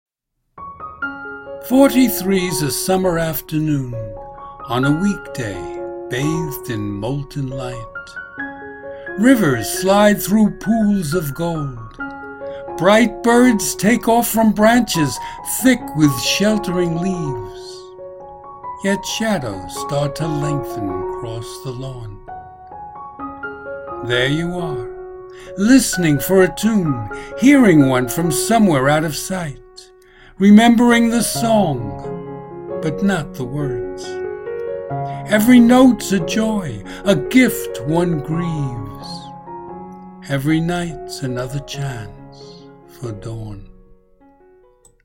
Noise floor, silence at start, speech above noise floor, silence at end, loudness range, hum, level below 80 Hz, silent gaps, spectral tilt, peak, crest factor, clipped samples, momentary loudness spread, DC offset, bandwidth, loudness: -71 dBFS; 0.55 s; 55 dB; 1.35 s; 10 LU; none; -42 dBFS; none; -5 dB/octave; 0 dBFS; 18 dB; under 0.1%; 20 LU; under 0.1%; 16.5 kHz; -17 LUFS